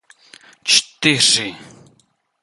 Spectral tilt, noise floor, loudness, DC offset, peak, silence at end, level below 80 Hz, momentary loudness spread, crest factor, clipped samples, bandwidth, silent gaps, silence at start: -1 dB/octave; -60 dBFS; -14 LUFS; under 0.1%; 0 dBFS; 0.8 s; -62 dBFS; 13 LU; 20 dB; under 0.1%; 12 kHz; none; 0.65 s